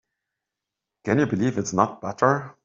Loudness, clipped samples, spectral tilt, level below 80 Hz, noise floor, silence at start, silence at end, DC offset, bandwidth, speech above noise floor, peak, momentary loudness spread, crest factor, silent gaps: -23 LUFS; under 0.1%; -6 dB/octave; -62 dBFS; -86 dBFS; 1.05 s; 0.15 s; under 0.1%; 7.8 kHz; 63 dB; -2 dBFS; 3 LU; 22 dB; none